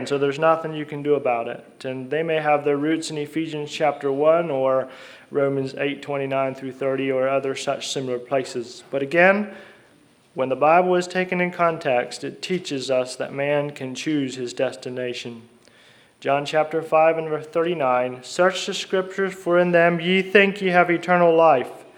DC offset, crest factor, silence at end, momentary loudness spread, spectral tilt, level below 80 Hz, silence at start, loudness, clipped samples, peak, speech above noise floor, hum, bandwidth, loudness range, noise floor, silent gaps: under 0.1%; 22 dB; 0.15 s; 12 LU; -5 dB/octave; -74 dBFS; 0 s; -22 LUFS; under 0.1%; 0 dBFS; 34 dB; none; 13 kHz; 6 LU; -55 dBFS; none